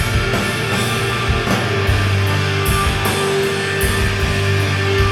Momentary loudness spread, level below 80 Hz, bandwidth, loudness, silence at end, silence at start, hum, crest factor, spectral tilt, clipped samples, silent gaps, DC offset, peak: 1 LU; -26 dBFS; 16 kHz; -17 LUFS; 0 s; 0 s; none; 14 dB; -4.5 dB/octave; under 0.1%; none; under 0.1%; -2 dBFS